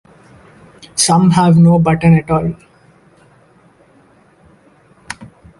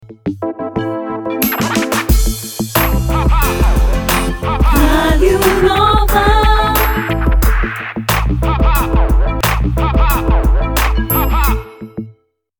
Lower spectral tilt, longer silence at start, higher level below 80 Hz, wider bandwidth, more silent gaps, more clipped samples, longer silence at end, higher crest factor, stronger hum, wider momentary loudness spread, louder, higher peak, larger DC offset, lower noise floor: about the same, -6 dB/octave vs -5 dB/octave; first, 0.95 s vs 0.05 s; second, -42 dBFS vs -16 dBFS; second, 11.5 kHz vs over 20 kHz; neither; neither; second, 0.35 s vs 0.5 s; about the same, 16 dB vs 12 dB; neither; first, 22 LU vs 9 LU; first, -11 LUFS vs -14 LUFS; about the same, 0 dBFS vs 0 dBFS; neither; about the same, -49 dBFS vs -47 dBFS